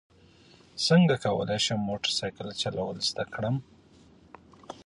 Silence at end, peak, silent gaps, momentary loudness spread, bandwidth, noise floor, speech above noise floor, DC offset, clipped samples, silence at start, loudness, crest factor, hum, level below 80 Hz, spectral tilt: 0.05 s; -10 dBFS; none; 12 LU; 11 kHz; -57 dBFS; 30 dB; under 0.1%; under 0.1%; 0.75 s; -27 LUFS; 20 dB; none; -60 dBFS; -5 dB/octave